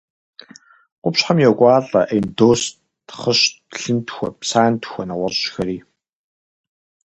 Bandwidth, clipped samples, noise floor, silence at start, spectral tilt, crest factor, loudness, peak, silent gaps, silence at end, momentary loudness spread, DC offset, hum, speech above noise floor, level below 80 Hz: 9 kHz; under 0.1%; -47 dBFS; 1.05 s; -4.5 dB/octave; 20 dB; -18 LUFS; 0 dBFS; none; 1.25 s; 13 LU; under 0.1%; none; 29 dB; -54 dBFS